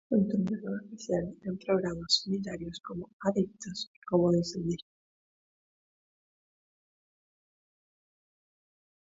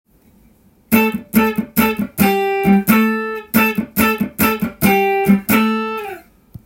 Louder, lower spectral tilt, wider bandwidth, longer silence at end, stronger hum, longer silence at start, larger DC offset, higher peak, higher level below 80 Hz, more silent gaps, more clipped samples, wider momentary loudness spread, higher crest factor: second, -32 LUFS vs -16 LUFS; about the same, -5.5 dB/octave vs -5.5 dB/octave; second, 8 kHz vs 17 kHz; first, 4.4 s vs 0.45 s; neither; second, 0.1 s vs 0.9 s; neither; second, -12 dBFS vs 0 dBFS; second, -62 dBFS vs -46 dBFS; first, 3.13-3.20 s, 3.87-4.02 s vs none; neither; first, 12 LU vs 6 LU; first, 22 dB vs 16 dB